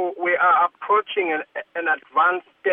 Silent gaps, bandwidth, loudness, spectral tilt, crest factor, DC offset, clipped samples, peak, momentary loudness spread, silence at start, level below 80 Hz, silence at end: none; 3.8 kHz; -21 LUFS; -6.5 dB/octave; 14 dB; under 0.1%; under 0.1%; -8 dBFS; 9 LU; 0 s; -82 dBFS; 0 s